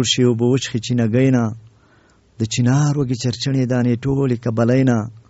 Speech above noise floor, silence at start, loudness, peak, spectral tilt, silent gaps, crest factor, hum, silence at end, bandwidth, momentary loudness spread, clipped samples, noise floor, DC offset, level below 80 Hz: 37 dB; 0 s; -18 LUFS; -4 dBFS; -6.5 dB/octave; none; 14 dB; none; 0.1 s; 8 kHz; 6 LU; under 0.1%; -54 dBFS; under 0.1%; -50 dBFS